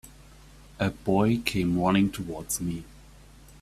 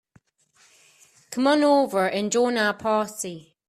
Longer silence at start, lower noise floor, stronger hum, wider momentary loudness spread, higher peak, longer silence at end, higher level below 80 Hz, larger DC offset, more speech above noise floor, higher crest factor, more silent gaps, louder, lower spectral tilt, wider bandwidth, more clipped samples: second, 0.05 s vs 1.3 s; second, -51 dBFS vs -61 dBFS; neither; second, 10 LU vs 13 LU; about the same, -6 dBFS vs -8 dBFS; first, 0.6 s vs 0.3 s; first, -50 dBFS vs -70 dBFS; neither; second, 25 dB vs 39 dB; about the same, 22 dB vs 18 dB; neither; second, -27 LUFS vs -22 LUFS; first, -5.5 dB/octave vs -3.5 dB/octave; about the same, 15.5 kHz vs 14.5 kHz; neither